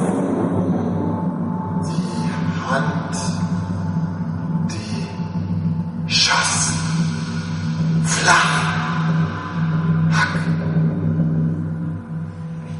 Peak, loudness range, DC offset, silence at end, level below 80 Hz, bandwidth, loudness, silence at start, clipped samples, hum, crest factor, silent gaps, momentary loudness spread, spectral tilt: -2 dBFS; 5 LU; under 0.1%; 0 s; -48 dBFS; 11.5 kHz; -20 LUFS; 0 s; under 0.1%; none; 18 dB; none; 10 LU; -4.5 dB/octave